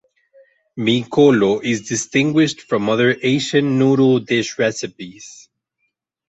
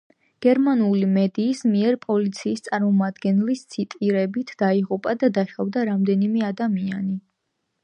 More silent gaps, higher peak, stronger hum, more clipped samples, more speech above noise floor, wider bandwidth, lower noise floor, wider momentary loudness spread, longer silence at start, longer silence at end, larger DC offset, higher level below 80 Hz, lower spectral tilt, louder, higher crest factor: neither; first, -2 dBFS vs -6 dBFS; neither; neither; about the same, 56 dB vs 55 dB; second, 8.2 kHz vs 9.6 kHz; second, -72 dBFS vs -76 dBFS; first, 17 LU vs 7 LU; first, 0.75 s vs 0.4 s; first, 1 s vs 0.65 s; neither; first, -58 dBFS vs -70 dBFS; second, -5 dB/octave vs -7.5 dB/octave; first, -17 LUFS vs -22 LUFS; about the same, 16 dB vs 16 dB